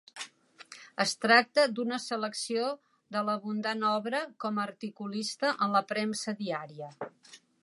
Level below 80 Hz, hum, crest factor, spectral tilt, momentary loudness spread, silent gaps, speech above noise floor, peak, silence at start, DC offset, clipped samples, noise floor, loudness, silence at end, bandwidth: -82 dBFS; none; 24 dB; -3.5 dB/octave; 19 LU; none; 23 dB; -8 dBFS; 0.15 s; under 0.1%; under 0.1%; -53 dBFS; -30 LUFS; 0.25 s; 11.5 kHz